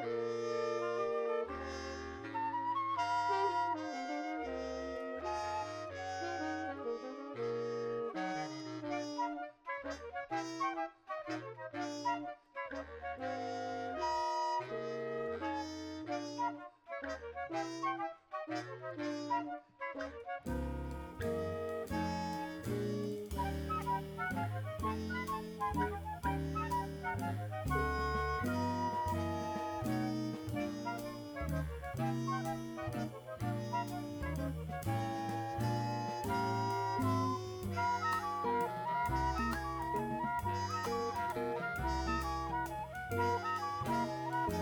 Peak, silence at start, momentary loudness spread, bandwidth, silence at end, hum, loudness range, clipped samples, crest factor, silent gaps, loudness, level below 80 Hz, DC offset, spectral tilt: -22 dBFS; 0 s; 8 LU; over 20 kHz; 0 s; none; 5 LU; under 0.1%; 16 dB; none; -39 LUFS; -52 dBFS; under 0.1%; -6 dB/octave